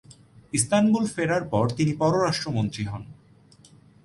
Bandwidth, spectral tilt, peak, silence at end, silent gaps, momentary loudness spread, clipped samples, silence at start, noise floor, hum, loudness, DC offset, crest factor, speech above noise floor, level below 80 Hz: 11.5 kHz; -5 dB/octave; -8 dBFS; 0.9 s; none; 9 LU; under 0.1%; 0.1 s; -54 dBFS; none; -24 LUFS; under 0.1%; 16 dB; 31 dB; -54 dBFS